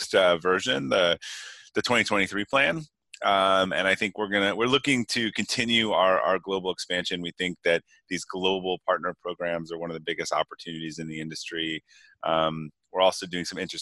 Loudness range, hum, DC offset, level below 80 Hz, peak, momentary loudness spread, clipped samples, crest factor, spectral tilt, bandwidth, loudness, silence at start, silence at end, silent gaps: 7 LU; none; under 0.1%; -64 dBFS; -8 dBFS; 12 LU; under 0.1%; 20 dB; -3.5 dB/octave; 12.5 kHz; -26 LUFS; 0 s; 0 s; none